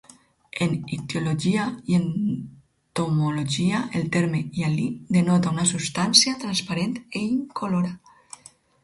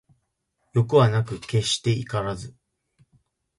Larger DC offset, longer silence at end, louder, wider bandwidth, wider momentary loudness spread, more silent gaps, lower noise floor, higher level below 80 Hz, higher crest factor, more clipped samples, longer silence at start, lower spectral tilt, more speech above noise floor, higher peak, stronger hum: neither; second, 0.85 s vs 1.1 s; about the same, -23 LUFS vs -23 LUFS; about the same, 11.5 kHz vs 11.5 kHz; about the same, 11 LU vs 13 LU; neither; second, -49 dBFS vs -74 dBFS; about the same, -58 dBFS vs -54 dBFS; about the same, 24 dB vs 20 dB; neither; second, 0.55 s vs 0.75 s; about the same, -4.5 dB/octave vs -5.5 dB/octave; second, 25 dB vs 52 dB; first, 0 dBFS vs -4 dBFS; neither